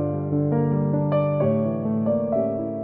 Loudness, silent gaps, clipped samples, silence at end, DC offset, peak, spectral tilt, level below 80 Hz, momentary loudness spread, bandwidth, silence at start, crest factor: -23 LUFS; none; under 0.1%; 0 s; under 0.1%; -10 dBFS; -13.5 dB/octave; -58 dBFS; 3 LU; 3.6 kHz; 0 s; 12 dB